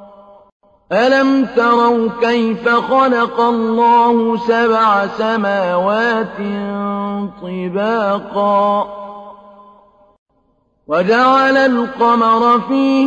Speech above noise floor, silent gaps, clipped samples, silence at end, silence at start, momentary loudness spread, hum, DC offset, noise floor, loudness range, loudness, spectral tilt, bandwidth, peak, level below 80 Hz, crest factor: 46 dB; 0.52-0.60 s, 10.18-10.26 s; under 0.1%; 0 s; 0 s; 10 LU; none; under 0.1%; -60 dBFS; 6 LU; -14 LUFS; -6.5 dB/octave; 8.2 kHz; -2 dBFS; -56 dBFS; 12 dB